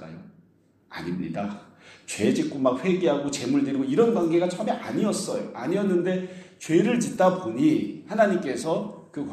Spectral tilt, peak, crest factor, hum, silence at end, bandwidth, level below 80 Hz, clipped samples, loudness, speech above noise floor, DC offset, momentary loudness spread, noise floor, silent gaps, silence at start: -6 dB/octave; -6 dBFS; 18 dB; none; 0 s; 13.5 kHz; -66 dBFS; under 0.1%; -25 LUFS; 36 dB; under 0.1%; 14 LU; -61 dBFS; none; 0 s